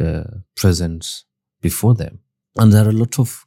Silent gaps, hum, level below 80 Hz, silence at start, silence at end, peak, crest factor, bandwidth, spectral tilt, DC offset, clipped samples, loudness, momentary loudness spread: none; none; -40 dBFS; 0 s; 0.1 s; 0 dBFS; 16 dB; 16.5 kHz; -6.5 dB/octave; under 0.1%; under 0.1%; -17 LUFS; 18 LU